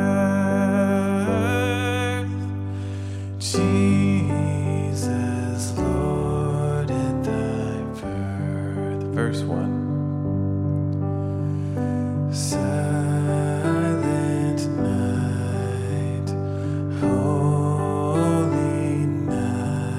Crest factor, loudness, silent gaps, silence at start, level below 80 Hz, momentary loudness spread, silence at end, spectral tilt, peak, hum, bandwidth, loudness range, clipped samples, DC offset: 14 dB; -23 LUFS; none; 0 s; -44 dBFS; 6 LU; 0 s; -7 dB/octave; -8 dBFS; none; 13.5 kHz; 3 LU; under 0.1%; under 0.1%